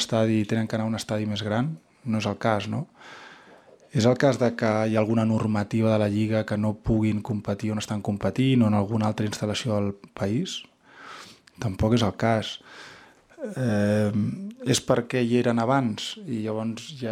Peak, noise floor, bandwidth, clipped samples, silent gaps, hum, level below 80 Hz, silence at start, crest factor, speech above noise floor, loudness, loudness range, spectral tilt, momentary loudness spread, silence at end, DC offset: -6 dBFS; -52 dBFS; 14 kHz; under 0.1%; none; none; -52 dBFS; 0 s; 20 dB; 28 dB; -25 LUFS; 5 LU; -6 dB/octave; 12 LU; 0 s; under 0.1%